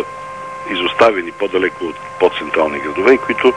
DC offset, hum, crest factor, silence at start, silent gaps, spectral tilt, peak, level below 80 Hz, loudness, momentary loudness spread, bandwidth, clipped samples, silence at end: 0.2%; none; 16 dB; 0 s; none; -4.5 dB/octave; 0 dBFS; -52 dBFS; -16 LUFS; 14 LU; 10.5 kHz; under 0.1%; 0 s